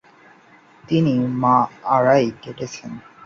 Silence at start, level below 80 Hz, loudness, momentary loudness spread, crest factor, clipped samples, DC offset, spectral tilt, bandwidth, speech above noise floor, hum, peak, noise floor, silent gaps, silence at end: 0.9 s; -58 dBFS; -18 LUFS; 16 LU; 18 dB; under 0.1%; under 0.1%; -7 dB/octave; 7.4 kHz; 31 dB; none; -2 dBFS; -50 dBFS; none; 0.25 s